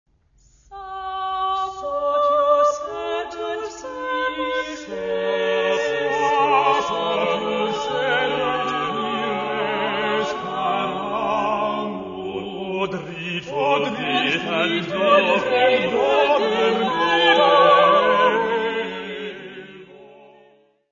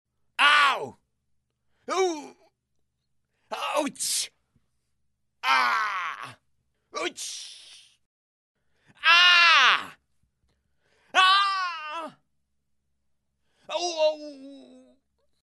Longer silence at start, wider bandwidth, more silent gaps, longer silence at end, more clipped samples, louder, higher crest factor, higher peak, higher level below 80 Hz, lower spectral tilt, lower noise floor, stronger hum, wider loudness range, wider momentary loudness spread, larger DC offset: first, 0.7 s vs 0.4 s; second, 7.4 kHz vs 12 kHz; second, none vs 8.06-8.55 s; about the same, 0.8 s vs 0.85 s; neither; about the same, -20 LUFS vs -21 LUFS; second, 18 dB vs 24 dB; about the same, -2 dBFS vs -4 dBFS; first, -56 dBFS vs -80 dBFS; first, -4 dB/octave vs 0.5 dB/octave; second, -57 dBFS vs -76 dBFS; neither; second, 7 LU vs 13 LU; second, 13 LU vs 23 LU; neither